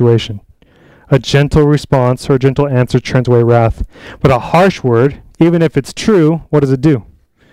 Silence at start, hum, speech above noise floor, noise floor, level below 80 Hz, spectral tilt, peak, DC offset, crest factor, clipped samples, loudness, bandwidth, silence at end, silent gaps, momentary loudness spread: 0 s; none; 34 dB; -45 dBFS; -32 dBFS; -7.5 dB/octave; 0 dBFS; under 0.1%; 12 dB; under 0.1%; -12 LUFS; 12.5 kHz; 0.5 s; none; 6 LU